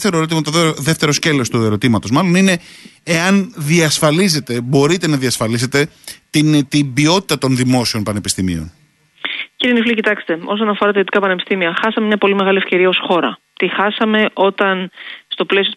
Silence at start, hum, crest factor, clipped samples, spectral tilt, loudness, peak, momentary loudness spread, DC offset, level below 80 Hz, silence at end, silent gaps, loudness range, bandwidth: 0 s; none; 14 dB; under 0.1%; -4.5 dB/octave; -15 LUFS; -2 dBFS; 8 LU; under 0.1%; -50 dBFS; 0 s; none; 2 LU; 12.5 kHz